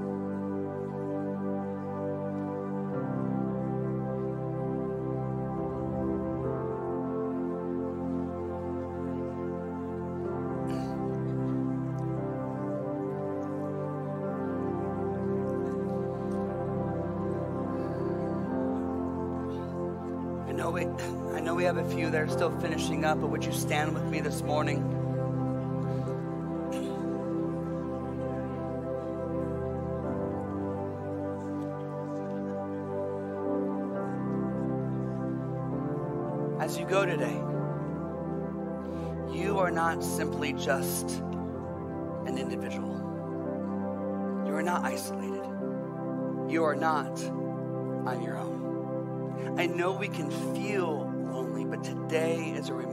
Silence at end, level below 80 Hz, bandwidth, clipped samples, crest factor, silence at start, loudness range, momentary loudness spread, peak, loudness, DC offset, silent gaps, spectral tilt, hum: 0 s; -58 dBFS; 16 kHz; under 0.1%; 18 dB; 0 s; 4 LU; 6 LU; -14 dBFS; -32 LUFS; under 0.1%; none; -6.5 dB/octave; none